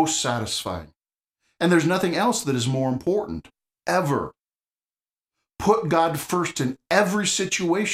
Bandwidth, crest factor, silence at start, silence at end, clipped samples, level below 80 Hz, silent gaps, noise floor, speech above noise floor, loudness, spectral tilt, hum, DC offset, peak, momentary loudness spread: 15.5 kHz; 20 dB; 0 s; 0 s; under 0.1%; -54 dBFS; 4.40-4.44 s; under -90 dBFS; over 67 dB; -23 LUFS; -4 dB/octave; none; under 0.1%; -4 dBFS; 9 LU